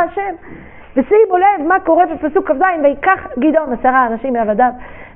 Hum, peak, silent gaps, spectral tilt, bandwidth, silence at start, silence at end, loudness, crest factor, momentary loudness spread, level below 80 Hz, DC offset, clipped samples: none; 0 dBFS; none; -4.5 dB/octave; 3.5 kHz; 0 s; 0.1 s; -14 LUFS; 14 dB; 8 LU; -42 dBFS; 0.7%; under 0.1%